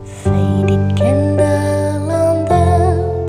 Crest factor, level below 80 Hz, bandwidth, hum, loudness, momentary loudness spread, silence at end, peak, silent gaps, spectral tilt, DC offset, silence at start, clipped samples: 12 dB; -32 dBFS; 10.5 kHz; none; -14 LUFS; 4 LU; 0 s; 0 dBFS; none; -8 dB/octave; under 0.1%; 0 s; under 0.1%